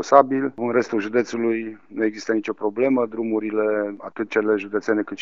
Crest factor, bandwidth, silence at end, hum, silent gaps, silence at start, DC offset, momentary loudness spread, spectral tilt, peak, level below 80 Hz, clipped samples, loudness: 22 dB; 7.6 kHz; 0 s; none; none; 0 s; 0.2%; 5 LU; -4.5 dB/octave; 0 dBFS; -74 dBFS; under 0.1%; -22 LUFS